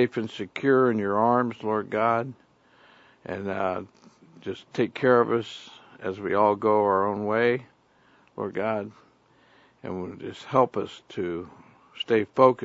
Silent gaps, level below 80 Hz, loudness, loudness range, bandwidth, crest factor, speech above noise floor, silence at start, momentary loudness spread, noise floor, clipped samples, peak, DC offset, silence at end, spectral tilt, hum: none; -70 dBFS; -25 LUFS; 6 LU; 7.8 kHz; 22 dB; 36 dB; 0 s; 17 LU; -60 dBFS; under 0.1%; -4 dBFS; under 0.1%; 0 s; -7 dB/octave; none